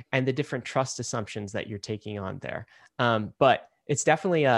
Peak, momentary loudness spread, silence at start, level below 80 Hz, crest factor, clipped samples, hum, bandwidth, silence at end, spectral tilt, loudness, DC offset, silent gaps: -6 dBFS; 12 LU; 0.1 s; -66 dBFS; 20 dB; under 0.1%; none; 12 kHz; 0 s; -4.5 dB/octave; -28 LUFS; under 0.1%; none